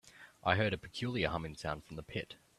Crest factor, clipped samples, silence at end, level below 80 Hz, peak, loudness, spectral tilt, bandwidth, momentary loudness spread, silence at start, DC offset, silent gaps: 26 dB; under 0.1%; 0.25 s; -58 dBFS; -12 dBFS; -37 LUFS; -5.5 dB/octave; 13.5 kHz; 11 LU; 0.05 s; under 0.1%; none